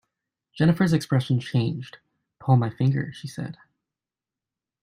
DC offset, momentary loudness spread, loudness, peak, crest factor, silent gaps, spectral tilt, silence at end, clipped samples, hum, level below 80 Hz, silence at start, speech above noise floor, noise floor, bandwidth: under 0.1%; 15 LU; -24 LUFS; -6 dBFS; 20 dB; none; -7.5 dB/octave; 1.3 s; under 0.1%; none; -60 dBFS; 0.55 s; 67 dB; -90 dBFS; 14.5 kHz